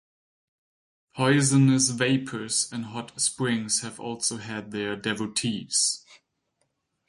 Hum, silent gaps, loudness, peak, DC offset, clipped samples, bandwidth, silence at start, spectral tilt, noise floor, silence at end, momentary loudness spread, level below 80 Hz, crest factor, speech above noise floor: none; none; -25 LUFS; -8 dBFS; under 0.1%; under 0.1%; 11.5 kHz; 1.15 s; -3.5 dB/octave; -75 dBFS; 0.95 s; 14 LU; -66 dBFS; 20 dB; 50 dB